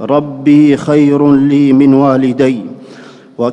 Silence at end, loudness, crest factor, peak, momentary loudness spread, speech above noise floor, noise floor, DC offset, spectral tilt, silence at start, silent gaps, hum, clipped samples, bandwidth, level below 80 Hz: 0 s; -9 LUFS; 10 dB; 0 dBFS; 8 LU; 26 dB; -34 dBFS; under 0.1%; -8 dB/octave; 0 s; none; none; 0.5%; 8.4 kHz; -52 dBFS